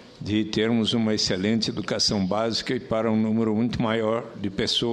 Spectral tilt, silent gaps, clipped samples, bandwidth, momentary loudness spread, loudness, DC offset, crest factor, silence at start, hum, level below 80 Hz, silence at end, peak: -4.5 dB/octave; none; under 0.1%; 11.5 kHz; 5 LU; -24 LUFS; under 0.1%; 16 dB; 0 s; none; -52 dBFS; 0 s; -8 dBFS